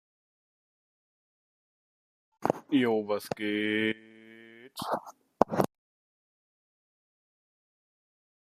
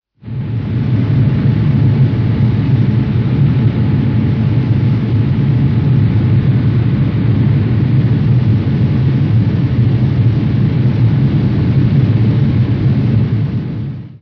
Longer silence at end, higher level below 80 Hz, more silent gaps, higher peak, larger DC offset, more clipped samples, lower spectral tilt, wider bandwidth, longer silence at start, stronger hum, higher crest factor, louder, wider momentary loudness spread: first, 2.85 s vs 0.05 s; second, -70 dBFS vs -30 dBFS; neither; about the same, -2 dBFS vs -2 dBFS; neither; neither; second, -5.5 dB/octave vs -10.5 dB/octave; first, 14.5 kHz vs 5.4 kHz; first, 2.4 s vs 0.25 s; neither; first, 32 dB vs 10 dB; second, -30 LUFS vs -13 LUFS; first, 12 LU vs 3 LU